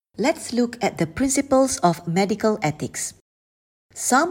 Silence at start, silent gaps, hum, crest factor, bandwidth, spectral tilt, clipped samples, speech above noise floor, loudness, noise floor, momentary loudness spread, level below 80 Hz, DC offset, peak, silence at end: 0.2 s; 3.21-3.89 s; none; 18 dB; 16.5 kHz; -4.5 dB/octave; under 0.1%; over 69 dB; -22 LUFS; under -90 dBFS; 9 LU; -52 dBFS; under 0.1%; -4 dBFS; 0 s